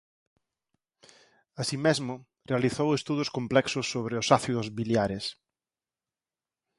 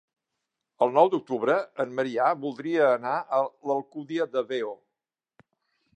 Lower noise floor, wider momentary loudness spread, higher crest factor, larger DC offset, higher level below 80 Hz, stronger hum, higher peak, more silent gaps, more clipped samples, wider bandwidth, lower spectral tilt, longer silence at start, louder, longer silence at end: about the same, under -90 dBFS vs -88 dBFS; about the same, 11 LU vs 9 LU; about the same, 26 dB vs 22 dB; neither; first, -62 dBFS vs -84 dBFS; neither; about the same, -4 dBFS vs -6 dBFS; neither; neither; first, 11.5 kHz vs 9 kHz; second, -5 dB/octave vs -6.5 dB/octave; first, 1.55 s vs 0.8 s; about the same, -28 LUFS vs -26 LUFS; first, 1.45 s vs 1.2 s